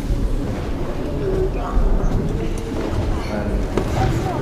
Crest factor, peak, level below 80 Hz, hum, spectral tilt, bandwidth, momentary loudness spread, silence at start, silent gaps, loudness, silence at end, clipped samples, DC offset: 16 dB; -4 dBFS; -22 dBFS; none; -7 dB/octave; 13 kHz; 5 LU; 0 s; none; -23 LUFS; 0 s; under 0.1%; under 0.1%